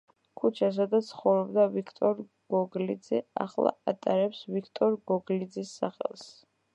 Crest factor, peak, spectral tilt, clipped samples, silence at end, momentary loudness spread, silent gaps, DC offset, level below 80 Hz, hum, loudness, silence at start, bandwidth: 20 dB; -10 dBFS; -7 dB/octave; under 0.1%; 0.45 s; 9 LU; none; under 0.1%; -82 dBFS; none; -29 LUFS; 0.4 s; 9 kHz